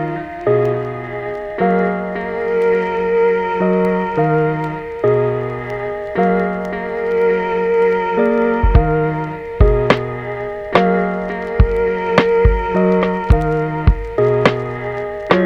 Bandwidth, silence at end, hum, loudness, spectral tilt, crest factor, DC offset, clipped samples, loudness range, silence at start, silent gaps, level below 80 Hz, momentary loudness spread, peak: 7.6 kHz; 0 s; none; -17 LUFS; -8.5 dB/octave; 16 dB; under 0.1%; under 0.1%; 2 LU; 0 s; none; -24 dBFS; 9 LU; 0 dBFS